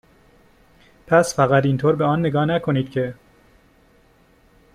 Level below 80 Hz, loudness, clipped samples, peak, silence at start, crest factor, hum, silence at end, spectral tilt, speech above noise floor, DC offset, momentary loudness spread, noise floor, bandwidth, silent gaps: -54 dBFS; -19 LUFS; under 0.1%; -2 dBFS; 1.1 s; 20 dB; none; 1.6 s; -6.5 dB/octave; 37 dB; under 0.1%; 8 LU; -55 dBFS; 14 kHz; none